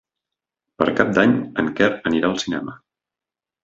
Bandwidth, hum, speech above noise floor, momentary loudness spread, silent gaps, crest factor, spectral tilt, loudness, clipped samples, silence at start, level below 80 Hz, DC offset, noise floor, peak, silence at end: 7.8 kHz; none; 70 dB; 10 LU; none; 22 dB; -5.5 dB/octave; -20 LUFS; under 0.1%; 0.8 s; -54 dBFS; under 0.1%; -89 dBFS; 0 dBFS; 0.9 s